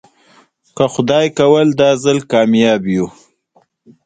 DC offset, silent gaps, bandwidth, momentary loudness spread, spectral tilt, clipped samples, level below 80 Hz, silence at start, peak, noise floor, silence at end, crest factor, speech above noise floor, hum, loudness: under 0.1%; none; 9.4 kHz; 7 LU; -5.5 dB/octave; under 0.1%; -54 dBFS; 0.75 s; 0 dBFS; -56 dBFS; 0.95 s; 14 dB; 44 dB; none; -13 LUFS